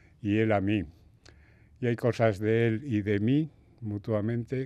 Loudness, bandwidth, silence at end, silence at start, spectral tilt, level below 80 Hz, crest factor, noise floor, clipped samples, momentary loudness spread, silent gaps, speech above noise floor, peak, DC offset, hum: -28 LUFS; 9.2 kHz; 0 s; 0.25 s; -8.5 dB/octave; -60 dBFS; 20 dB; -57 dBFS; under 0.1%; 11 LU; none; 30 dB; -10 dBFS; under 0.1%; none